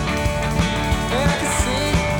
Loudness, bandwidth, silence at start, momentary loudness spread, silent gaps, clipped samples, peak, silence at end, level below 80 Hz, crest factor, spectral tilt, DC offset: -20 LUFS; 19 kHz; 0 s; 2 LU; none; under 0.1%; -10 dBFS; 0 s; -26 dBFS; 10 dB; -4.5 dB/octave; under 0.1%